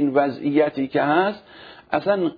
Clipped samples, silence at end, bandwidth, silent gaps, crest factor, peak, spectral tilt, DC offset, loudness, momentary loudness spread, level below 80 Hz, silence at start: under 0.1%; 0 s; 5 kHz; none; 16 dB; -6 dBFS; -9 dB/octave; under 0.1%; -21 LUFS; 6 LU; -62 dBFS; 0 s